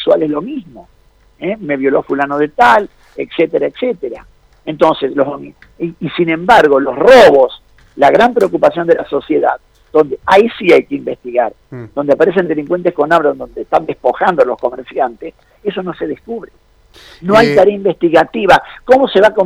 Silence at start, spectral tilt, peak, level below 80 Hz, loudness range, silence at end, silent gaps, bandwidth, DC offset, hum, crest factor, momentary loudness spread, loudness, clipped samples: 0 s; -6 dB/octave; 0 dBFS; -46 dBFS; 7 LU; 0 s; none; 14.5 kHz; under 0.1%; none; 12 dB; 16 LU; -12 LUFS; 0.5%